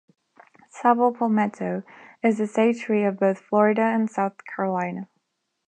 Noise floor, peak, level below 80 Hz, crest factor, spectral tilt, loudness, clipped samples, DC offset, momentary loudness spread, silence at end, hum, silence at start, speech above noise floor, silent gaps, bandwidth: -76 dBFS; -4 dBFS; -76 dBFS; 20 dB; -7.5 dB/octave; -23 LUFS; under 0.1%; under 0.1%; 10 LU; 0.65 s; none; 0.75 s; 54 dB; none; 9 kHz